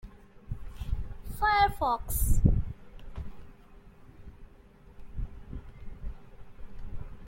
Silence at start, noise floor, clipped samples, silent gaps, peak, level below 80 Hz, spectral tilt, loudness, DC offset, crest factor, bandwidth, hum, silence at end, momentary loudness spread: 0.05 s; -54 dBFS; under 0.1%; none; -10 dBFS; -36 dBFS; -5 dB/octave; -30 LUFS; under 0.1%; 22 dB; 16.5 kHz; none; 0 s; 26 LU